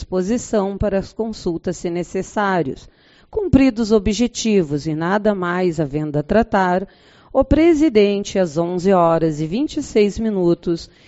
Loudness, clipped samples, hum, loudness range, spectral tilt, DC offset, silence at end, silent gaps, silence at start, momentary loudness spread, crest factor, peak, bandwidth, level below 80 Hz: -18 LUFS; under 0.1%; none; 4 LU; -6 dB/octave; under 0.1%; 0.25 s; none; 0 s; 9 LU; 18 dB; 0 dBFS; 8 kHz; -36 dBFS